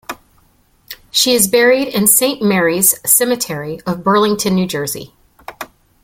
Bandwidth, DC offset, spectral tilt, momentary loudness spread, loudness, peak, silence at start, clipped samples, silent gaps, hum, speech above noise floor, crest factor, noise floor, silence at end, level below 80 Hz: 17 kHz; under 0.1%; -3 dB/octave; 21 LU; -13 LUFS; 0 dBFS; 0.1 s; under 0.1%; none; none; 40 dB; 16 dB; -54 dBFS; 0.4 s; -52 dBFS